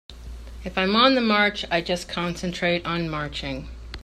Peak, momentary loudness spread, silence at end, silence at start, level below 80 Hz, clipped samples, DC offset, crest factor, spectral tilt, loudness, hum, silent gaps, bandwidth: -4 dBFS; 20 LU; 0 s; 0.1 s; -42 dBFS; under 0.1%; under 0.1%; 22 dB; -5 dB/octave; -23 LUFS; none; none; 13 kHz